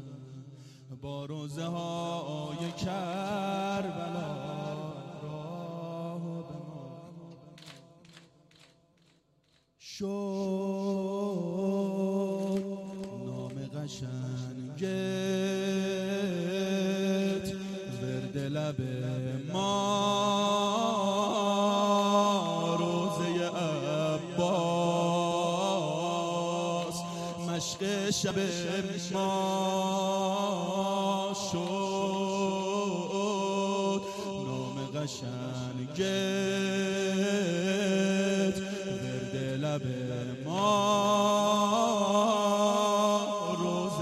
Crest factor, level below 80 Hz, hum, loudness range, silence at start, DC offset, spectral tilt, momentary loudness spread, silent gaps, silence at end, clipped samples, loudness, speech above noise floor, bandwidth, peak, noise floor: 16 dB; -68 dBFS; none; 10 LU; 0 s; under 0.1%; -5 dB/octave; 13 LU; none; 0 s; under 0.1%; -31 LUFS; 35 dB; 14 kHz; -14 dBFS; -69 dBFS